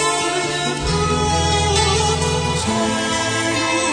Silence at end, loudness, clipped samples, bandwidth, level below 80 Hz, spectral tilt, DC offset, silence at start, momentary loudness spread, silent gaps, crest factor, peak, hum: 0 s; -18 LUFS; under 0.1%; 10 kHz; -32 dBFS; -3.5 dB/octave; under 0.1%; 0 s; 4 LU; none; 16 dB; -2 dBFS; none